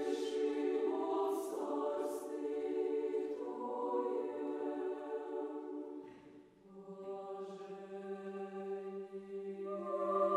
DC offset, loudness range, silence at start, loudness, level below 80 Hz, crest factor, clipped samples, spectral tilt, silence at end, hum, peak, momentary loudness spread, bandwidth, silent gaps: under 0.1%; 9 LU; 0 s; -40 LUFS; -84 dBFS; 18 dB; under 0.1%; -6 dB/octave; 0 s; none; -22 dBFS; 13 LU; 15 kHz; none